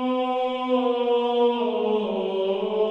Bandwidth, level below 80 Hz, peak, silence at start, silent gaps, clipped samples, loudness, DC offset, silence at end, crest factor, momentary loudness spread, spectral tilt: 5.6 kHz; -68 dBFS; -12 dBFS; 0 s; none; under 0.1%; -24 LUFS; under 0.1%; 0 s; 12 dB; 3 LU; -7 dB/octave